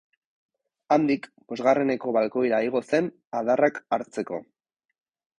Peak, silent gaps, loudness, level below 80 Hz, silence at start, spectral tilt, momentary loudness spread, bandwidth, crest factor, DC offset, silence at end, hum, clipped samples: -8 dBFS; 3.27-3.31 s; -25 LUFS; -70 dBFS; 0.9 s; -6.5 dB/octave; 10 LU; 10.5 kHz; 18 dB; under 0.1%; 1 s; none; under 0.1%